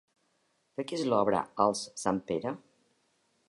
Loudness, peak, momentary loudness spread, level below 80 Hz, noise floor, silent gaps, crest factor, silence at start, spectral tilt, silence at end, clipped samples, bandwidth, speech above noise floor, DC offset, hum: -31 LUFS; -10 dBFS; 12 LU; -68 dBFS; -74 dBFS; none; 22 dB; 0.8 s; -5 dB/octave; 0.9 s; under 0.1%; 11.5 kHz; 44 dB; under 0.1%; none